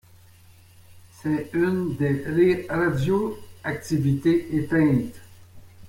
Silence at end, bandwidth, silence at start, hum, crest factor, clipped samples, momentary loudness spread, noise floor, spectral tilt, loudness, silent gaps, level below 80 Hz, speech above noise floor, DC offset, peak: 0 s; 16.5 kHz; 0.95 s; none; 16 dB; under 0.1%; 11 LU; -51 dBFS; -8 dB/octave; -24 LUFS; none; -52 dBFS; 29 dB; under 0.1%; -8 dBFS